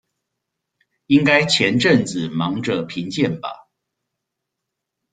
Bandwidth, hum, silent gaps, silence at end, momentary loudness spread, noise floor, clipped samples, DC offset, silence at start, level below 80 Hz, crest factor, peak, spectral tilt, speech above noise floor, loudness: 9.4 kHz; none; none; 1.55 s; 10 LU; -81 dBFS; under 0.1%; under 0.1%; 1.1 s; -58 dBFS; 20 dB; -2 dBFS; -5 dB/octave; 63 dB; -18 LUFS